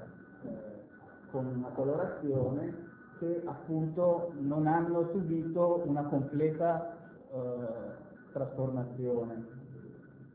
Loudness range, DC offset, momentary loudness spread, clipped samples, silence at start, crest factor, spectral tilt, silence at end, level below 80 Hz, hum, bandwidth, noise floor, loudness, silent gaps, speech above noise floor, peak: 6 LU; under 0.1%; 20 LU; under 0.1%; 0 s; 18 dB; -10.5 dB/octave; 0 s; -66 dBFS; none; 4 kHz; -54 dBFS; -34 LUFS; none; 21 dB; -18 dBFS